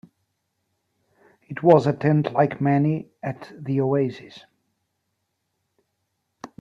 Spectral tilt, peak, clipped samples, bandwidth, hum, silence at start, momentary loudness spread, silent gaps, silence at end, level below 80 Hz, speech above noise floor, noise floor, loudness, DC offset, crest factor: -9 dB/octave; -2 dBFS; under 0.1%; 7.4 kHz; none; 1.5 s; 16 LU; none; 0.15 s; -64 dBFS; 55 dB; -76 dBFS; -21 LUFS; under 0.1%; 22 dB